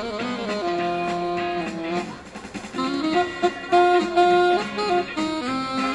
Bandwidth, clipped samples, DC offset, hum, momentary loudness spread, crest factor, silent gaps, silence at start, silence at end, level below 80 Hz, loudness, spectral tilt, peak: 11 kHz; under 0.1%; under 0.1%; none; 11 LU; 16 dB; none; 0 s; 0 s; -54 dBFS; -23 LUFS; -5 dB/octave; -6 dBFS